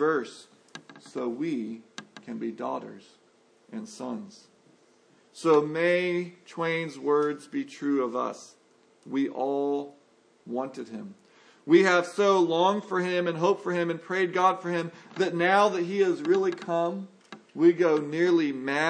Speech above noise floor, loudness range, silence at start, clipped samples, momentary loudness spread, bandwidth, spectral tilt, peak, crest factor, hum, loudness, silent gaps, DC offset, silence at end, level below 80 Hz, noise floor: 35 dB; 11 LU; 0 s; under 0.1%; 20 LU; 10.5 kHz; -5.5 dB/octave; -8 dBFS; 20 dB; none; -26 LUFS; none; under 0.1%; 0 s; -86 dBFS; -62 dBFS